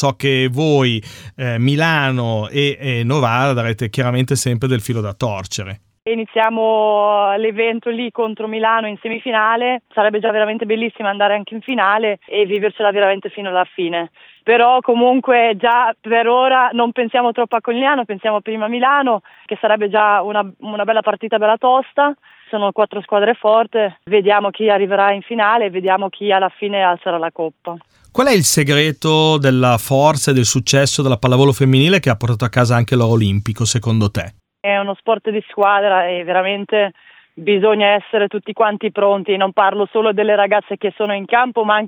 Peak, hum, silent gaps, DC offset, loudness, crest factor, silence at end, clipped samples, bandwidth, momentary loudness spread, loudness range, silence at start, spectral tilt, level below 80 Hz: 0 dBFS; none; none; under 0.1%; -16 LUFS; 16 dB; 0 s; under 0.1%; 17.5 kHz; 9 LU; 4 LU; 0 s; -5 dB/octave; -52 dBFS